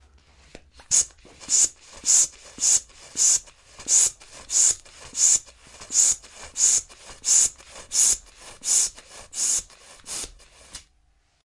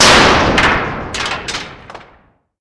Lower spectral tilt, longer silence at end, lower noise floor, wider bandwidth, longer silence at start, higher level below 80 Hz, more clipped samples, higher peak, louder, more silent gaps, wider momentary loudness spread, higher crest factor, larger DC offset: second, 2 dB/octave vs -2.5 dB/octave; about the same, 0.7 s vs 0.6 s; first, -64 dBFS vs -51 dBFS; about the same, 11.5 kHz vs 11 kHz; first, 0.9 s vs 0 s; second, -54 dBFS vs -30 dBFS; second, under 0.1% vs 0.1%; second, -4 dBFS vs 0 dBFS; second, -20 LUFS vs -12 LUFS; neither; about the same, 15 LU vs 16 LU; first, 20 dB vs 14 dB; neither